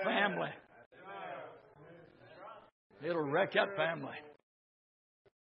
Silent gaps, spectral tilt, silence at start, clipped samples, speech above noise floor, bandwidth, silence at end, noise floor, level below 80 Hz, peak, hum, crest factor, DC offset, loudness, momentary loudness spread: 0.86-0.91 s, 2.72-2.90 s; -2.5 dB/octave; 0 s; under 0.1%; 23 dB; 5.2 kHz; 1.15 s; -58 dBFS; -86 dBFS; -14 dBFS; none; 26 dB; under 0.1%; -36 LUFS; 26 LU